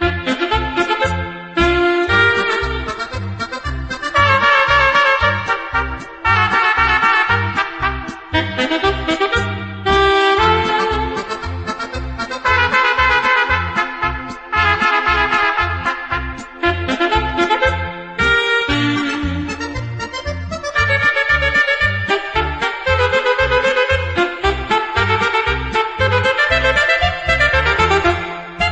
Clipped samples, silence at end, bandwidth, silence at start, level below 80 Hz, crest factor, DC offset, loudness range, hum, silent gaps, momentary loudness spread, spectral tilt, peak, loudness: under 0.1%; 0 s; 8.8 kHz; 0 s; -30 dBFS; 16 dB; under 0.1%; 3 LU; none; none; 11 LU; -5 dB/octave; 0 dBFS; -15 LUFS